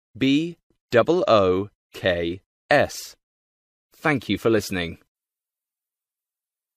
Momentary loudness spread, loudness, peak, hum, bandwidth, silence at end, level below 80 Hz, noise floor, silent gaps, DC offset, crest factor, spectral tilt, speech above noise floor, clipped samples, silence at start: 14 LU; -22 LUFS; -4 dBFS; none; 15.5 kHz; 1.8 s; -56 dBFS; under -90 dBFS; 0.63-0.70 s, 0.81-0.88 s, 1.75-1.90 s, 2.46-2.69 s, 3.23-3.90 s; under 0.1%; 20 dB; -5.5 dB/octave; over 69 dB; under 0.1%; 0.15 s